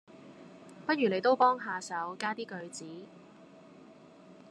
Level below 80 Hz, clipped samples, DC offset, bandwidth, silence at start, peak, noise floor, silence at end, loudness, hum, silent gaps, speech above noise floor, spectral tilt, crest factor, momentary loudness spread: -86 dBFS; under 0.1%; under 0.1%; 11.5 kHz; 0.1 s; -14 dBFS; -55 dBFS; 0 s; -31 LUFS; none; none; 24 dB; -4.5 dB/octave; 20 dB; 26 LU